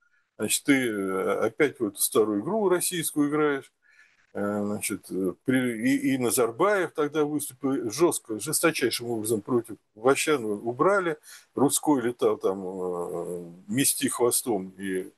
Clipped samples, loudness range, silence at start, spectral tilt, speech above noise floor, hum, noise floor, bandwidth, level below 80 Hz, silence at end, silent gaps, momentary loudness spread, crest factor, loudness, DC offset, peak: under 0.1%; 2 LU; 0.4 s; -4 dB/octave; 34 dB; none; -60 dBFS; 13 kHz; -74 dBFS; 0.1 s; none; 9 LU; 18 dB; -26 LUFS; under 0.1%; -8 dBFS